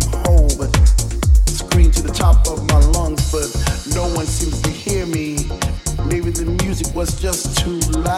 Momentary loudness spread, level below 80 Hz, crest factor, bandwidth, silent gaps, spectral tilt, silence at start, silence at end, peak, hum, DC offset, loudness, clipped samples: 7 LU; -16 dBFS; 14 dB; 15 kHz; none; -4.5 dB/octave; 0 s; 0 s; 0 dBFS; none; under 0.1%; -17 LUFS; under 0.1%